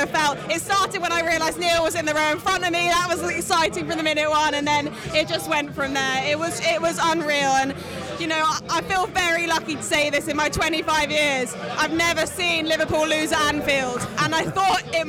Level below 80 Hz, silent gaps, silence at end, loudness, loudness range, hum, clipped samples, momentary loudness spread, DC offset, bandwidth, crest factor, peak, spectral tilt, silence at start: -48 dBFS; none; 0 s; -21 LUFS; 1 LU; none; under 0.1%; 4 LU; under 0.1%; over 20 kHz; 14 dB; -8 dBFS; -3 dB/octave; 0 s